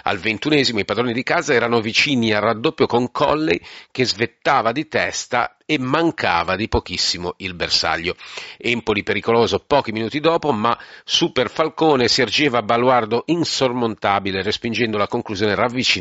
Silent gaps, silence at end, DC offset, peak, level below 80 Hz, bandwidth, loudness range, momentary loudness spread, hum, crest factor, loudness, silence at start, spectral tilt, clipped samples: none; 0 s; under 0.1%; -2 dBFS; -46 dBFS; 8 kHz; 2 LU; 6 LU; none; 18 dB; -19 LUFS; 0.05 s; -2.5 dB/octave; under 0.1%